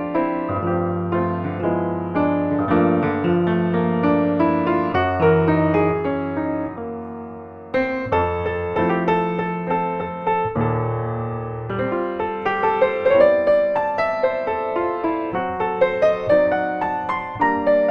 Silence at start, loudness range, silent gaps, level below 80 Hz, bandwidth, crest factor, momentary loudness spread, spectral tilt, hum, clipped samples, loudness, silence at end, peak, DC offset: 0 s; 4 LU; none; -48 dBFS; 6.2 kHz; 18 dB; 8 LU; -9.5 dB/octave; none; under 0.1%; -20 LUFS; 0 s; -2 dBFS; under 0.1%